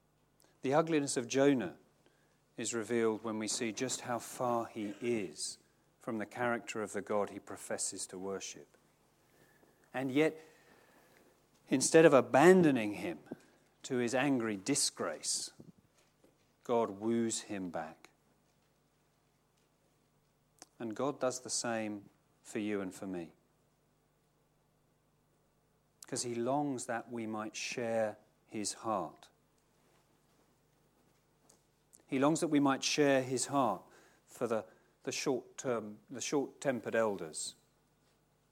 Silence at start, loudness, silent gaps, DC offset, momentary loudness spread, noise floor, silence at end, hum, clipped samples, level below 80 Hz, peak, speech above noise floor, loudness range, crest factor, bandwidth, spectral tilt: 0.65 s; -34 LUFS; none; under 0.1%; 14 LU; -74 dBFS; 1 s; 50 Hz at -75 dBFS; under 0.1%; -82 dBFS; -10 dBFS; 40 dB; 15 LU; 26 dB; 16.5 kHz; -4 dB/octave